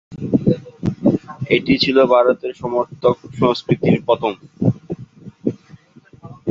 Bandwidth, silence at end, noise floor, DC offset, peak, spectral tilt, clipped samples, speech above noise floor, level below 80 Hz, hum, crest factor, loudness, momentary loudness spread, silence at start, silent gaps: 7.6 kHz; 0 s; -46 dBFS; under 0.1%; 0 dBFS; -7.5 dB/octave; under 0.1%; 30 dB; -48 dBFS; none; 18 dB; -18 LUFS; 12 LU; 0.1 s; none